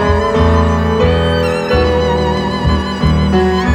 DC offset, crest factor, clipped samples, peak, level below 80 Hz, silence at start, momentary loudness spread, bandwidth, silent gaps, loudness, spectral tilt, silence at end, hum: under 0.1%; 12 dB; under 0.1%; 0 dBFS; -20 dBFS; 0 s; 3 LU; 9.8 kHz; none; -13 LUFS; -7 dB/octave; 0 s; none